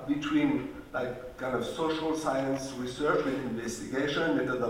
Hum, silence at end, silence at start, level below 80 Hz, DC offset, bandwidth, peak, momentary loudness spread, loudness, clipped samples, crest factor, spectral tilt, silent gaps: none; 0 s; 0 s; -56 dBFS; under 0.1%; 16 kHz; -16 dBFS; 8 LU; -31 LUFS; under 0.1%; 16 dB; -5 dB/octave; none